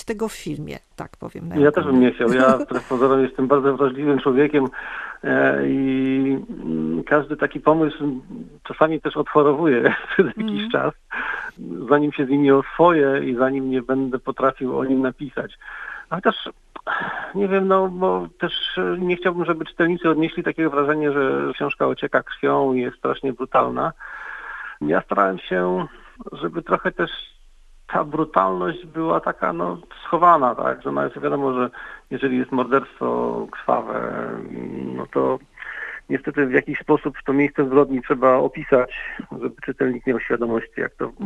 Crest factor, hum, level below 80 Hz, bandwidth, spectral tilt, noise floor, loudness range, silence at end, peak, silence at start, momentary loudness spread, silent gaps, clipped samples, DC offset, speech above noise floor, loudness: 20 dB; none; -50 dBFS; 10.5 kHz; -7 dB/octave; -48 dBFS; 5 LU; 0 s; 0 dBFS; 0 s; 14 LU; none; under 0.1%; under 0.1%; 27 dB; -21 LUFS